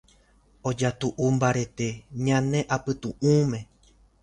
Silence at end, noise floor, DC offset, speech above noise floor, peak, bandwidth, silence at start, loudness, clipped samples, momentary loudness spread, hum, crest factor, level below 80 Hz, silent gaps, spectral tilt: 0.6 s; -60 dBFS; under 0.1%; 35 dB; -8 dBFS; 10.5 kHz; 0.65 s; -26 LUFS; under 0.1%; 9 LU; none; 18 dB; -54 dBFS; none; -6 dB/octave